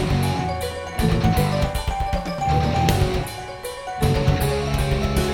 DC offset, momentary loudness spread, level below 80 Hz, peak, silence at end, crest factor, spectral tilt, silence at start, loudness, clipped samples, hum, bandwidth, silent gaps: under 0.1%; 8 LU; -28 dBFS; -4 dBFS; 0 s; 16 dB; -6 dB/octave; 0 s; -22 LUFS; under 0.1%; none; 18 kHz; none